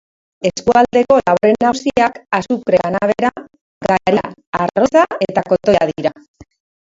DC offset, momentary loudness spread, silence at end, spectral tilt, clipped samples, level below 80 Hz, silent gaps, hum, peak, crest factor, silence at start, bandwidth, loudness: under 0.1%; 8 LU; 0.4 s; -5.5 dB/octave; under 0.1%; -48 dBFS; 3.61-3.81 s, 4.47-4.53 s, 6.28-6.34 s; none; 0 dBFS; 16 dB; 0.4 s; 7.8 kHz; -15 LUFS